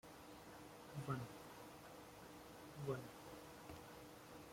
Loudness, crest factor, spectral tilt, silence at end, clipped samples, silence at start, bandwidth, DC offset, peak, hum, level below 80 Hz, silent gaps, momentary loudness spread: -54 LUFS; 22 dB; -5.5 dB/octave; 0 s; under 0.1%; 0.05 s; 16.5 kHz; under 0.1%; -30 dBFS; none; -74 dBFS; none; 10 LU